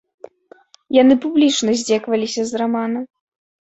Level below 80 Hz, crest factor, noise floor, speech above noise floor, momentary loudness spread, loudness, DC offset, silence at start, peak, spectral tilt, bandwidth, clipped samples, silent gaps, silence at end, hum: -62 dBFS; 16 dB; -49 dBFS; 33 dB; 10 LU; -17 LUFS; under 0.1%; 0.9 s; -2 dBFS; -3.5 dB/octave; 8.2 kHz; under 0.1%; none; 0.55 s; none